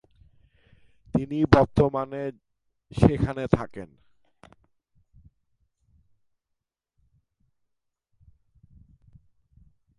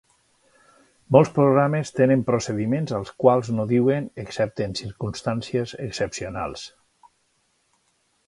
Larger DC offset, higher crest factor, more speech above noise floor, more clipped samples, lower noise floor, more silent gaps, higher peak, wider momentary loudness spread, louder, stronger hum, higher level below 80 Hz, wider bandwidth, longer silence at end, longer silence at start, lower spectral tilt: neither; about the same, 28 dB vs 24 dB; first, 60 dB vs 46 dB; neither; first, -83 dBFS vs -68 dBFS; neither; about the same, -2 dBFS vs 0 dBFS; first, 19 LU vs 12 LU; about the same, -24 LUFS vs -23 LUFS; neither; first, -44 dBFS vs -54 dBFS; about the same, 11 kHz vs 11.5 kHz; first, 6.15 s vs 1.6 s; about the same, 1.15 s vs 1.1 s; first, -8.5 dB/octave vs -6.5 dB/octave